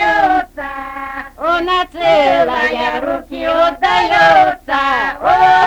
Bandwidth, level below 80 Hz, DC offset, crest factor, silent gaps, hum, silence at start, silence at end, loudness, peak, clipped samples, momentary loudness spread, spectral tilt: 19.5 kHz; -40 dBFS; under 0.1%; 12 dB; none; none; 0 s; 0 s; -13 LUFS; 0 dBFS; under 0.1%; 15 LU; -4 dB/octave